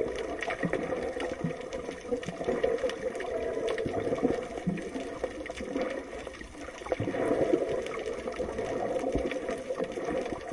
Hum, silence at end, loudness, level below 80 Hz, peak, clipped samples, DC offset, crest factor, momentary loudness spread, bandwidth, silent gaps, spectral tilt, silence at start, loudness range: none; 0 s; -33 LUFS; -52 dBFS; -12 dBFS; under 0.1%; under 0.1%; 20 dB; 8 LU; 11.5 kHz; none; -6 dB/octave; 0 s; 2 LU